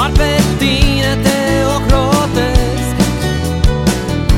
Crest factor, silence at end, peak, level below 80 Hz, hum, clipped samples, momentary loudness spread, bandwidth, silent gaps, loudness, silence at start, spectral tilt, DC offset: 12 dB; 0 s; 0 dBFS; -18 dBFS; none; 0.2%; 3 LU; 17 kHz; none; -13 LUFS; 0 s; -5 dB/octave; under 0.1%